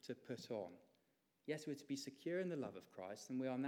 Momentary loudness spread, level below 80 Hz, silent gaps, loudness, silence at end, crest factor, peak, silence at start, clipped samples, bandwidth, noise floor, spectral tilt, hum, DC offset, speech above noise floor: 10 LU; under -90 dBFS; none; -48 LUFS; 0 s; 16 dB; -30 dBFS; 0.05 s; under 0.1%; 17.5 kHz; -82 dBFS; -5.5 dB/octave; none; under 0.1%; 35 dB